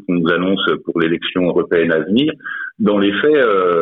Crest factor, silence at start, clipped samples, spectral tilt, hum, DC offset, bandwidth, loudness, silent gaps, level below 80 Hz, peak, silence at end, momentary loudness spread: 12 dB; 0.1 s; under 0.1%; -9 dB/octave; none; under 0.1%; 4.1 kHz; -16 LUFS; none; -54 dBFS; -2 dBFS; 0 s; 5 LU